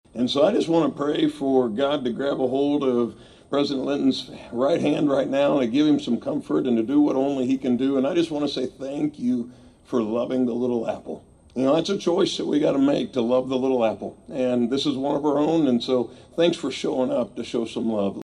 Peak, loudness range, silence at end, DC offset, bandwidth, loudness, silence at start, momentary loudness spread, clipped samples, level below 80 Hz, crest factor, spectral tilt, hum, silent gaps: -6 dBFS; 3 LU; 0 s; under 0.1%; 10.5 kHz; -23 LUFS; 0.15 s; 7 LU; under 0.1%; -60 dBFS; 16 dB; -6 dB/octave; none; none